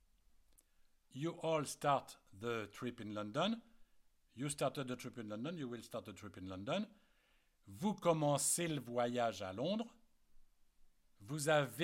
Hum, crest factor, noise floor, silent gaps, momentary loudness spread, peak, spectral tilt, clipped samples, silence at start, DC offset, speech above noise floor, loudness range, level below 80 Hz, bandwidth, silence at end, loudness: none; 20 dB; -74 dBFS; none; 14 LU; -22 dBFS; -4 dB/octave; under 0.1%; 1.15 s; under 0.1%; 35 dB; 6 LU; -74 dBFS; 16.5 kHz; 0 s; -40 LUFS